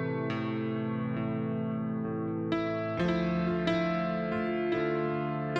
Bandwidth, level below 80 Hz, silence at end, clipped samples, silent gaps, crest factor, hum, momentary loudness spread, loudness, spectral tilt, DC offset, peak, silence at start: 7.2 kHz; -56 dBFS; 0 s; under 0.1%; none; 16 dB; none; 4 LU; -31 LUFS; -8 dB/octave; under 0.1%; -16 dBFS; 0 s